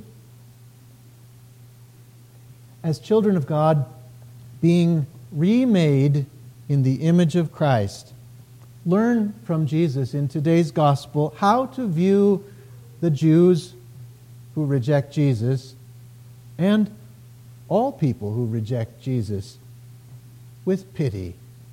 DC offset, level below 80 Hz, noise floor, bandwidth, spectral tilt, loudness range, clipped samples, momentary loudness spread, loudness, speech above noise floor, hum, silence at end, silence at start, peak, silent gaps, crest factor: under 0.1%; -60 dBFS; -48 dBFS; 15 kHz; -8 dB/octave; 6 LU; under 0.1%; 13 LU; -21 LUFS; 28 dB; none; 0 s; 2.85 s; -6 dBFS; none; 16 dB